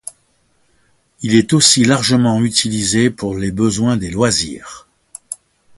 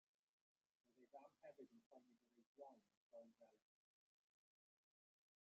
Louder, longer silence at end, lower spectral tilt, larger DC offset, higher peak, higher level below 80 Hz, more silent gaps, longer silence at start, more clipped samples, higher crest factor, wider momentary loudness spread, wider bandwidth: first, -14 LUFS vs -67 LUFS; second, 0.45 s vs 1.9 s; about the same, -4 dB/octave vs -4.5 dB/octave; neither; first, 0 dBFS vs -50 dBFS; first, -44 dBFS vs under -90 dBFS; second, none vs 1.86-1.91 s, 2.46-2.55 s, 2.97-3.10 s; first, 1.2 s vs 0.85 s; neither; second, 16 dB vs 22 dB; first, 20 LU vs 3 LU; first, 11.5 kHz vs 6.8 kHz